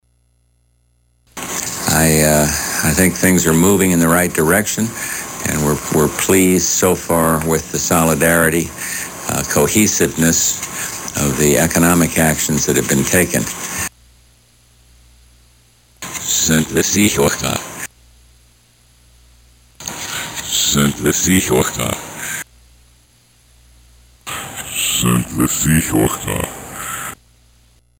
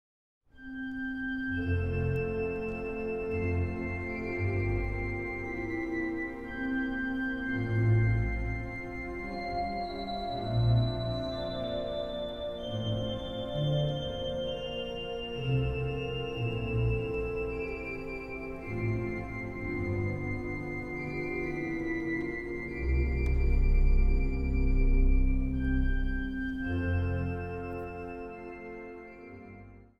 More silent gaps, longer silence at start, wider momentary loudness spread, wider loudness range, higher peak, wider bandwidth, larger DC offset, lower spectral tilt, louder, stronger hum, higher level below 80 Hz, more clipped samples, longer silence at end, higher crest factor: neither; first, 1.35 s vs 0.55 s; first, 13 LU vs 9 LU; first, 7 LU vs 4 LU; first, 0 dBFS vs -14 dBFS; first, over 20 kHz vs 6.6 kHz; neither; second, -3.5 dB/octave vs -8 dB/octave; first, -15 LUFS vs -33 LUFS; first, 60 Hz at -45 dBFS vs none; about the same, -38 dBFS vs -34 dBFS; neither; first, 0.85 s vs 0.15 s; about the same, 18 dB vs 16 dB